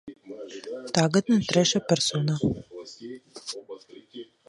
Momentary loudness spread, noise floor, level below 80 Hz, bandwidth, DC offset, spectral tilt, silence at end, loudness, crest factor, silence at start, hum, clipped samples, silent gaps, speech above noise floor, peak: 22 LU; -45 dBFS; -56 dBFS; 11.5 kHz; under 0.1%; -4.5 dB/octave; 0.25 s; -24 LUFS; 22 dB; 0.05 s; none; under 0.1%; none; 21 dB; -6 dBFS